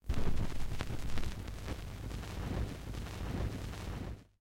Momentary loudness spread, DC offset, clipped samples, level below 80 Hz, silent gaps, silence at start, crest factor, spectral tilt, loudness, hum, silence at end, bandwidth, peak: 5 LU; under 0.1%; under 0.1%; -40 dBFS; none; 0.05 s; 18 dB; -6 dB/octave; -42 LUFS; none; 0.15 s; 15.5 kHz; -16 dBFS